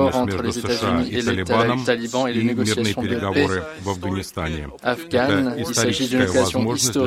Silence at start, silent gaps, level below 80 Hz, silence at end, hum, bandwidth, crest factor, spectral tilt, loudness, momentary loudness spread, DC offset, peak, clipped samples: 0 s; none; -48 dBFS; 0 s; none; 16 kHz; 18 dB; -4.5 dB/octave; -21 LUFS; 7 LU; under 0.1%; -2 dBFS; under 0.1%